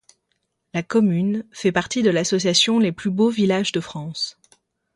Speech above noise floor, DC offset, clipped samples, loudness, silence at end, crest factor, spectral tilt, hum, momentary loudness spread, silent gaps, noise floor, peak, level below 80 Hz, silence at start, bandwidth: 53 dB; under 0.1%; under 0.1%; -20 LUFS; 0.65 s; 20 dB; -4.5 dB/octave; none; 11 LU; none; -73 dBFS; -2 dBFS; -60 dBFS; 0.75 s; 11.5 kHz